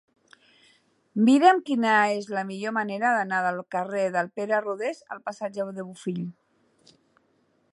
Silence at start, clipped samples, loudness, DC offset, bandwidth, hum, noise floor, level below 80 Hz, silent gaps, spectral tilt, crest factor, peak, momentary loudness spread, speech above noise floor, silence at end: 1.15 s; under 0.1%; -25 LUFS; under 0.1%; 11.5 kHz; none; -67 dBFS; -80 dBFS; none; -5.5 dB/octave; 22 dB; -4 dBFS; 15 LU; 43 dB; 1.4 s